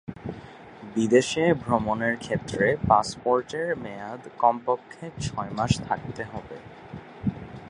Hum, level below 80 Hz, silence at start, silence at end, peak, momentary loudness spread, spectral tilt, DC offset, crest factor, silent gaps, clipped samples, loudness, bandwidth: none; -50 dBFS; 0.1 s; 0 s; -4 dBFS; 20 LU; -5.5 dB/octave; under 0.1%; 22 dB; none; under 0.1%; -26 LUFS; 11.5 kHz